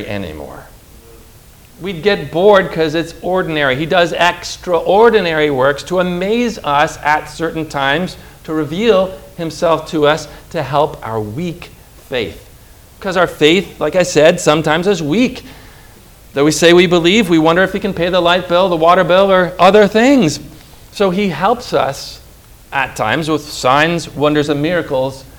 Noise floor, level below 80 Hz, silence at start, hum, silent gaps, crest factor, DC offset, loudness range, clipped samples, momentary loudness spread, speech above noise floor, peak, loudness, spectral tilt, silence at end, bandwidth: -41 dBFS; -40 dBFS; 0 s; none; none; 14 dB; under 0.1%; 6 LU; 0.2%; 14 LU; 28 dB; 0 dBFS; -13 LUFS; -5 dB/octave; 0.1 s; over 20 kHz